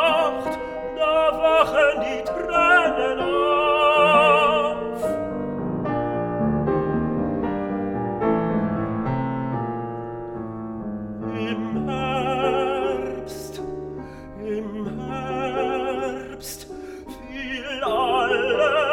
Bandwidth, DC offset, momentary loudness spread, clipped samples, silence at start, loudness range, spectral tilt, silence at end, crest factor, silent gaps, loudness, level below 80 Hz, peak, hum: 17 kHz; under 0.1%; 15 LU; under 0.1%; 0 s; 10 LU; -5.5 dB/octave; 0 s; 18 dB; none; -22 LUFS; -46 dBFS; -4 dBFS; none